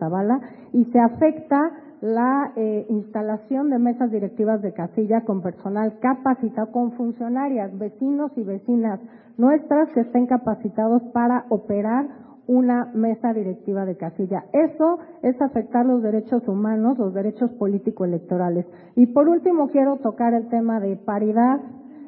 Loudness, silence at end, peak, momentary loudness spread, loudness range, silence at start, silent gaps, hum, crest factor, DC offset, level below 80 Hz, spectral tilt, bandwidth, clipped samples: -22 LUFS; 0 s; -4 dBFS; 8 LU; 3 LU; 0 s; none; none; 16 dB; under 0.1%; -66 dBFS; -13.5 dB/octave; 2.7 kHz; under 0.1%